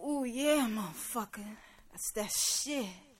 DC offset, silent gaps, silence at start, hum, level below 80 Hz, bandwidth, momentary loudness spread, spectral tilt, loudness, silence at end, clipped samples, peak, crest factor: under 0.1%; none; 0 s; none; -62 dBFS; 16.5 kHz; 17 LU; -2 dB/octave; -33 LUFS; 0.15 s; under 0.1%; -18 dBFS; 18 dB